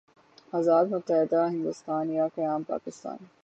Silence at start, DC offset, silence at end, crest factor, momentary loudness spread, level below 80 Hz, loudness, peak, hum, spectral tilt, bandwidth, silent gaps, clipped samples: 0.55 s; under 0.1%; 0.15 s; 16 dB; 12 LU; -80 dBFS; -27 LUFS; -12 dBFS; none; -7.5 dB/octave; 8.4 kHz; none; under 0.1%